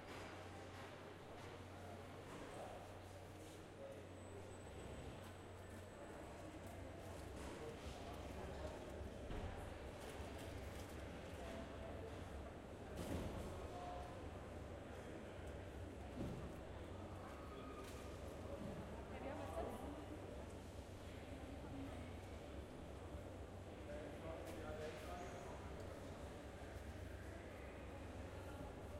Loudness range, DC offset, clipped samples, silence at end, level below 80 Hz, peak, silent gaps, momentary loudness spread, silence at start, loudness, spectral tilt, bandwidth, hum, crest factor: 4 LU; under 0.1%; under 0.1%; 0 s; -60 dBFS; -34 dBFS; none; 5 LU; 0 s; -53 LUFS; -6 dB/octave; 16 kHz; none; 18 dB